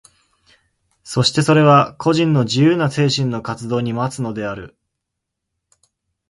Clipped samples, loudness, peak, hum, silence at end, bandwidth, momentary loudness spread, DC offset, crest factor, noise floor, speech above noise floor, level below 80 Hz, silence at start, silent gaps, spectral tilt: under 0.1%; -17 LUFS; 0 dBFS; none; 1.65 s; 11.5 kHz; 13 LU; under 0.1%; 18 dB; -79 dBFS; 63 dB; -54 dBFS; 1.05 s; none; -6 dB/octave